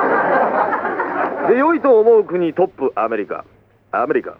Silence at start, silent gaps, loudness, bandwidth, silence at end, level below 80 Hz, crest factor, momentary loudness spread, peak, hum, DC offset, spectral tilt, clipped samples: 0 s; none; -16 LUFS; 4.8 kHz; 0.05 s; -62 dBFS; 14 dB; 10 LU; -2 dBFS; none; under 0.1%; -8.5 dB/octave; under 0.1%